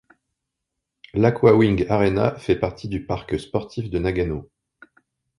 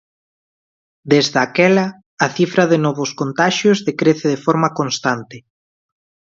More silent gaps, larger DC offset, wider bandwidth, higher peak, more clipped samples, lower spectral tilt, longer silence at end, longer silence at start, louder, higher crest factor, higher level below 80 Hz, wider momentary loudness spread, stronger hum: second, none vs 2.06-2.17 s; neither; first, 11 kHz vs 7.8 kHz; about the same, -2 dBFS vs 0 dBFS; neither; first, -8 dB/octave vs -5 dB/octave; about the same, 0.95 s vs 1 s; about the same, 1.15 s vs 1.05 s; second, -21 LUFS vs -16 LUFS; about the same, 20 dB vs 18 dB; first, -42 dBFS vs -62 dBFS; first, 12 LU vs 7 LU; neither